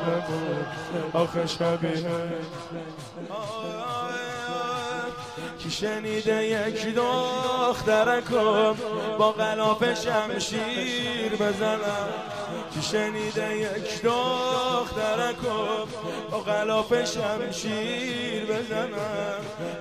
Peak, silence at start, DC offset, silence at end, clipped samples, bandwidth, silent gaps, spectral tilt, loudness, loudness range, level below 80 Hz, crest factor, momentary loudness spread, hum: -8 dBFS; 0 s; under 0.1%; 0 s; under 0.1%; 15 kHz; none; -4.5 dB/octave; -27 LUFS; 7 LU; -58 dBFS; 18 dB; 10 LU; none